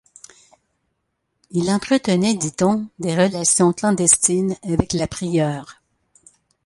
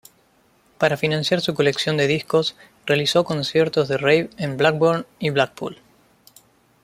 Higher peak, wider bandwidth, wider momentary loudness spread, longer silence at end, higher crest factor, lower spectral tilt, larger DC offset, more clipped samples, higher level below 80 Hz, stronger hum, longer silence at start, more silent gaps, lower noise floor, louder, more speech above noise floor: about the same, 0 dBFS vs 0 dBFS; second, 11.5 kHz vs 16 kHz; first, 9 LU vs 6 LU; second, 0.95 s vs 1.1 s; about the same, 20 dB vs 20 dB; about the same, -4.5 dB/octave vs -5 dB/octave; neither; neither; first, -46 dBFS vs -60 dBFS; neither; first, 1.55 s vs 0.8 s; neither; first, -73 dBFS vs -59 dBFS; about the same, -18 LUFS vs -20 LUFS; first, 55 dB vs 39 dB